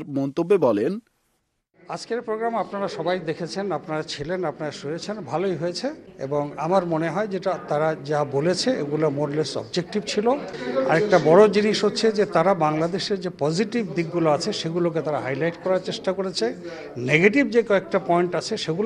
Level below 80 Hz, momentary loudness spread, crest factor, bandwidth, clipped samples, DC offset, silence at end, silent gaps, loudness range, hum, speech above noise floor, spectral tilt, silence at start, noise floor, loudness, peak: -62 dBFS; 11 LU; 22 dB; 11 kHz; under 0.1%; under 0.1%; 0 s; none; 8 LU; none; 49 dB; -5.5 dB/octave; 0 s; -72 dBFS; -23 LUFS; -2 dBFS